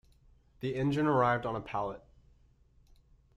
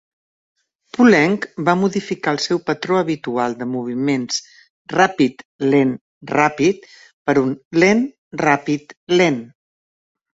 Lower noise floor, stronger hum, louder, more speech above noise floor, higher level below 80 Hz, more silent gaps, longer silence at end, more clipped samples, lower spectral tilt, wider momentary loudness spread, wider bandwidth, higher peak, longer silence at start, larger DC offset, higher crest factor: second, -64 dBFS vs under -90 dBFS; neither; second, -32 LUFS vs -18 LUFS; second, 33 dB vs over 73 dB; about the same, -60 dBFS vs -60 dBFS; second, none vs 4.70-4.85 s, 5.45-5.59 s, 6.01-6.21 s, 7.13-7.25 s, 7.65-7.71 s, 8.18-8.31 s, 8.97-9.07 s; first, 1.4 s vs 0.9 s; neither; first, -8 dB/octave vs -5 dB/octave; first, 13 LU vs 10 LU; first, 11.5 kHz vs 8 kHz; second, -14 dBFS vs -2 dBFS; second, 0.6 s vs 1 s; neither; about the same, 20 dB vs 18 dB